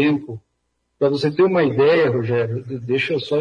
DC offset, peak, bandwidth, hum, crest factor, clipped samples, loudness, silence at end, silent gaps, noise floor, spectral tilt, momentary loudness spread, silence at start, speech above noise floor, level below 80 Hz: under 0.1%; -6 dBFS; 10 kHz; none; 14 dB; under 0.1%; -19 LUFS; 0 s; none; -71 dBFS; -7.5 dB/octave; 11 LU; 0 s; 53 dB; -60 dBFS